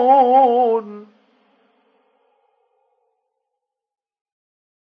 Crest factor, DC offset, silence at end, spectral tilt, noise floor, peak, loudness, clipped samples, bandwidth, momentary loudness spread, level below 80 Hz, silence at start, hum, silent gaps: 18 dB; under 0.1%; 3.9 s; -7.5 dB/octave; -81 dBFS; -2 dBFS; -15 LUFS; under 0.1%; 5 kHz; 25 LU; under -90 dBFS; 0 s; none; none